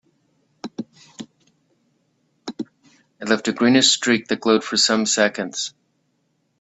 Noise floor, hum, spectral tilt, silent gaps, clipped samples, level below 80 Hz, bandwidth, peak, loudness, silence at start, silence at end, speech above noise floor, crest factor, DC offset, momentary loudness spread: -68 dBFS; none; -2.5 dB/octave; none; under 0.1%; -68 dBFS; 8.4 kHz; -2 dBFS; -18 LUFS; 0.65 s; 0.95 s; 50 dB; 22 dB; under 0.1%; 24 LU